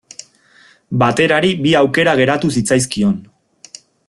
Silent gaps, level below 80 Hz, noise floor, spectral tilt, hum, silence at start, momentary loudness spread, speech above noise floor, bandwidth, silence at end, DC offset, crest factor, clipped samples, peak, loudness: none; -50 dBFS; -49 dBFS; -5 dB/octave; none; 0.9 s; 11 LU; 35 dB; 12.5 kHz; 0.85 s; under 0.1%; 16 dB; under 0.1%; 0 dBFS; -14 LUFS